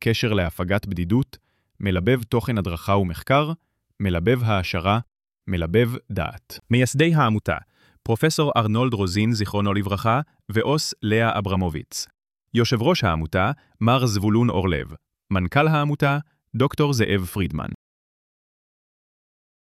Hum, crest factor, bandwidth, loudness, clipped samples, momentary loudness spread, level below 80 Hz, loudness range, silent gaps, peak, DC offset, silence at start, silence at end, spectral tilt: none; 18 dB; 15 kHz; -22 LUFS; under 0.1%; 10 LU; -44 dBFS; 2 LU; none; -4 dBFS; under 0.1%; 0 s; 1.9 s; -6 dB/octave